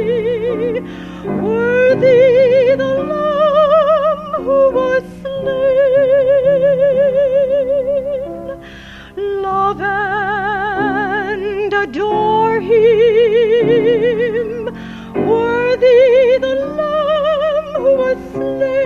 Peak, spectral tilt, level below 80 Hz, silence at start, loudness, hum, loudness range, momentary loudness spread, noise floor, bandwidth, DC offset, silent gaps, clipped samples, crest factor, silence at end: -2 dBFS; -7 dB/octave; -44 dBFS; 0 s; -14 LUFS; none; 5 LU; 12 LU; -34 dBFS; 6.8 kHz; under 0.1%; none; under 0.1%; 12 dB; 0 s